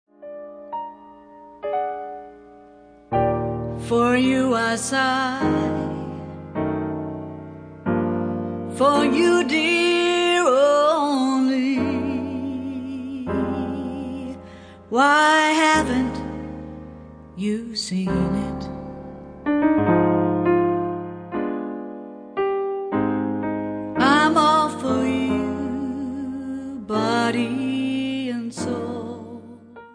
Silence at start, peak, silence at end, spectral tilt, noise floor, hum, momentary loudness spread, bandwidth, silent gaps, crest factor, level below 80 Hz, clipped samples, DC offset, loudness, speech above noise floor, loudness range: 0.2 s; -4 dBFS; 0.05 s; -5 dB/octave; -48 dBFS; none; 18 LU; 10.5 kHz; none; 18 dB; -48 dBFS; under 0.1%; under 0.1%; -21 LUFS; 29 dB; 8 LU